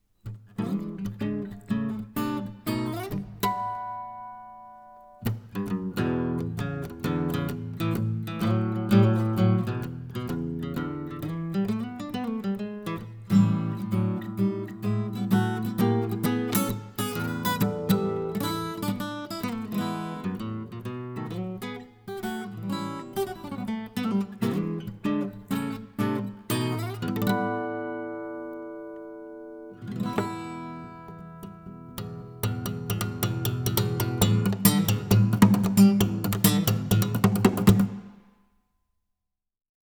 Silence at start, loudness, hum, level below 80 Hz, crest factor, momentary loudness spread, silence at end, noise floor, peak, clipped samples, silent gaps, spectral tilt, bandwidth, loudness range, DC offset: 0.25 s; -27 LUFS; none; -54 dBFS; 24 dB; 16 LU; 1.8 s; -84 dBFS; -4 dBFS; under 0.1%; none; -6 dB/octave; over 20 kHz; 12 LU; under 0.1%